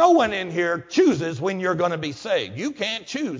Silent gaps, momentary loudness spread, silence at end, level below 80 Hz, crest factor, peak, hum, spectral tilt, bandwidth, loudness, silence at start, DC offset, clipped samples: none; 8 LU; 0 s; -60 dBFS; 18 dB; -4 dBFS; none; -5 dB/octave; 7.6 kHz; -23 LUFS; 0 s; under 0.1%; under 0.1%